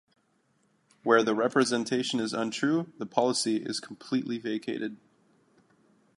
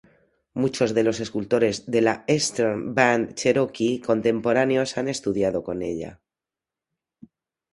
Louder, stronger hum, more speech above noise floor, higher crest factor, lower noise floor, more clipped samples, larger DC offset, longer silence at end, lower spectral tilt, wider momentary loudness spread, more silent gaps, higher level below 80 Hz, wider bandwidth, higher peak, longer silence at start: second, -28 LUFS vs -23 LUFS; neither; second, 42 dB vs 67 dB; about the same, 24 dB vs 22 dB; second, -70 dBFS vs -89 dBFS; neither; neither; second, 1.25 s vs 1.6 s; about the same, -4 dB/octave vs -4.5 dB/octave; first, 11 LU vs 8 LU; neither; second, -78 dBFS vs -58 dBFS; about the same, 11.5 kHz vs 11.5 kHz; second, -6 dBFS vs -2 dBFS; first, 1.05 s vs 0.55 s